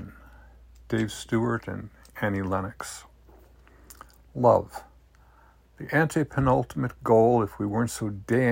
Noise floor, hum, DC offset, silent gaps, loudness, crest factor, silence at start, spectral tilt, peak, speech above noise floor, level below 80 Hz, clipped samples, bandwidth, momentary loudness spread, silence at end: -57 dBFS; none; under 0.1%; none; -26 LUFS; 20 dB; 0 s; -6.5 dB/octave; -8 dBFS; 32 dB; -52 dBFS; under 0.1%; 16.5 kHz; 19 LU; 0 s